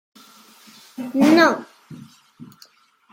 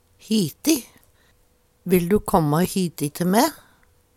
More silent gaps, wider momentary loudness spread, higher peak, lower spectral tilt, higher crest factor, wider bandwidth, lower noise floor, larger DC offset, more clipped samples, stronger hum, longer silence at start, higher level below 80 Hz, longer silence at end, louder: neither; first, 26 LU vs 5 LU; about the same, -2 dBFS vs -2 dBFS; about the same, -4.5 dB/octave vs -5.5 dB/octave; about the same, 20 dB vs 20 dB; about the same, 16.5 kHz vs 18 kHz; second, -53 dBFS vs -61 dBFS; neither; neither; neither; first, 1 s vs 0.3 s; second, -70 dBFS vs -48 dBFS; about the same, 0.7 s vs 0.6 s; first, -17 LUFS vs -21 LUFS